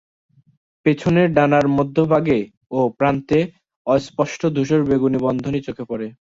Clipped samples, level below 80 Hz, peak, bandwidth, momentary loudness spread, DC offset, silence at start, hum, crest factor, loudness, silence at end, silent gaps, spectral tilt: under 0.1%; -50 dBFS; -2 dBFS; 7.8 kHz; 11 LU; under 0.1%; 0.85 s; none; 16 dB; -19 LUFS; 0.3 s; 2.57-2.61 s, 3.76-3.85 s; -7.5 dB/octave